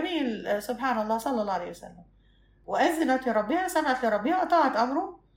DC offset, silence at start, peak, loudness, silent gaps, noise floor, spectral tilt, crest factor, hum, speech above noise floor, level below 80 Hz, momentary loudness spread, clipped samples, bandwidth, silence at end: under 0.1%; 0 s; -10 dBFS; -27 LUFS; none; -60 dBFS; -4 dB/octave; 16 dB; none; 34 dB; -60 dBFS; 8 LU; under 0.1%; 16 kHz; 0.2 s